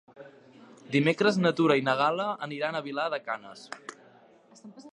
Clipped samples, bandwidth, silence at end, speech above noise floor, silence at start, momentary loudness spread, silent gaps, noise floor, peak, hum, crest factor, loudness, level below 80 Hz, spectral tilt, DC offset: under 0.1%; 11 kHz; 0.05 s; 29 dB; 0.2 s; 19 LU; none; -57 dBFS; -6 dBFS; none; 22 dB; -27 LUFS; -76 dBFS; -6 dB/octave; under 0.1%